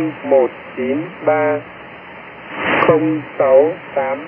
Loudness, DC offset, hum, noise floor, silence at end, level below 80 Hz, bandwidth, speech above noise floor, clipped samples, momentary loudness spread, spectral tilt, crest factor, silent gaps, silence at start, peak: -16 LUFS; under 0.1%; none; -35 dBFS; 0 s; -60 dBFS; 3.4 kHz; 19 dB; under 0.1%; 21 LU; -10.5 dB/octave; 16 dB; none; 0 s; 0 dBFS